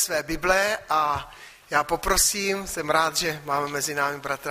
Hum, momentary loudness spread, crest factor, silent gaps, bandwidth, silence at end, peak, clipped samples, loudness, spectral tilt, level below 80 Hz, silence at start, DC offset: none; 7 LU; 20 dB; none; 15.5 kHz; 0 s; -6 dBFS; under 0.1%; -24 LUFS; -2 dB/octave; -44 dBFS; 0 s; under 0.1%